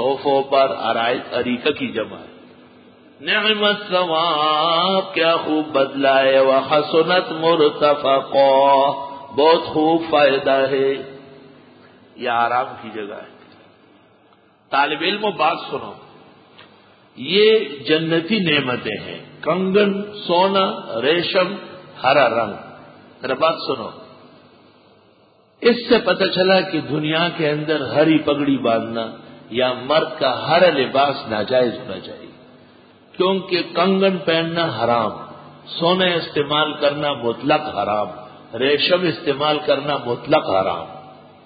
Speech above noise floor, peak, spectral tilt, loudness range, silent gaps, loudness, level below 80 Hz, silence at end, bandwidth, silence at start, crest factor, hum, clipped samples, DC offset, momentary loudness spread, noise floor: 36 dB; -2 dBFS; -10 dB/octave; 7 LU; none; -18 LUFS; -60 dBFS; 0.3 s; 5 kHz; 0 s; 16 dB; none; under 0.1%; under 0.1%; 13 LU; -54 dBFS